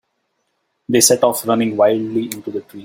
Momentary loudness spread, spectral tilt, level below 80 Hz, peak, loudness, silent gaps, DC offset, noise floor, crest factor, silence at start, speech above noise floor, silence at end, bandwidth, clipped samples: 13 LU; -3.5 dB/octave; -60 dBFS; 0 dBFS; -16 LUFS; none; under 0.1%; -70 dBFS; 18 dB; 0.9 s; 53 dB; 0 s; 16.5 kHz; under 0.1%